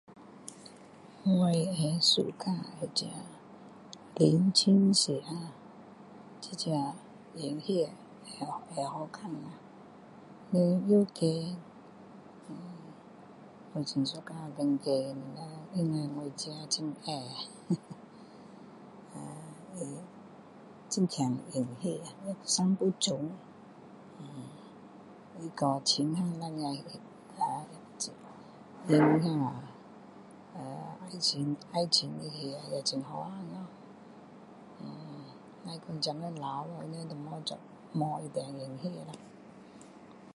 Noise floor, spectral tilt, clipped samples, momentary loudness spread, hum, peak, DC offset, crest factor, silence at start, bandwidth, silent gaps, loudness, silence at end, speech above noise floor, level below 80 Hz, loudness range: -53 dBFS; -5 dB/octave; under 0.1%; 25 LU; none; -10 dBFS; under 0.1%; 24 dB; 0.1 s; 11.5 kHz; none; -32 LUFS; 0.05 s; 22 dB; -76 dBFS; 11 LU